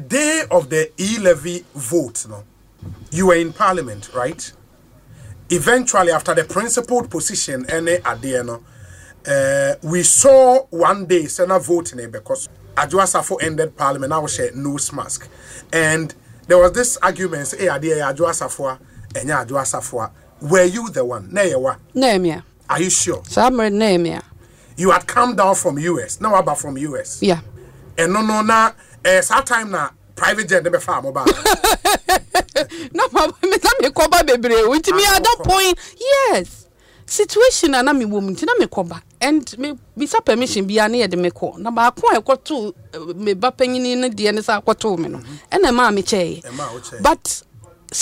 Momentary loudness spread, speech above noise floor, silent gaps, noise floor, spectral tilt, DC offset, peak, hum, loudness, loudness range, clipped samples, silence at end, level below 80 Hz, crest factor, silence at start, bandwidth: 13 LU; 31 dB; none; -48 dBFS; -3 dB/octave; under 0.1%; -2 dBFS; none; -17 LUFS; 5 LU; under 0.1%; 0 s; -42 dBFS; 16 dB; 0 s; 16 kHz